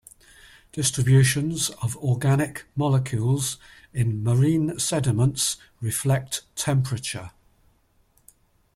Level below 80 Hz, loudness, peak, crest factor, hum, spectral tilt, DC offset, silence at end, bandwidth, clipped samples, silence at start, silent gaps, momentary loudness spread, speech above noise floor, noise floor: -52 dBFS; -23 LUFS; -6 dBFS; 18 dB; none; -5 dB/octave; under 0.1%; 1.45 s; 15 kHz; under 0.1%; 0.75 s; none; 11 LU; 40 dB; -63 dBFS